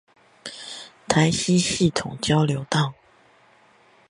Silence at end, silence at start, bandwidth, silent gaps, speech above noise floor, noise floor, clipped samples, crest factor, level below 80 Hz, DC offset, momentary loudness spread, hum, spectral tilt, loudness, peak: 1.2 s; 0.45 s; 11.5 kHz; none; 35 dB; -56 dBFS; under 0.1%; 22 dB; -52 dBFS; under 0.1%; 18 LU; none; -4.5 dB/octave; -22 LUFS; -2 dBFS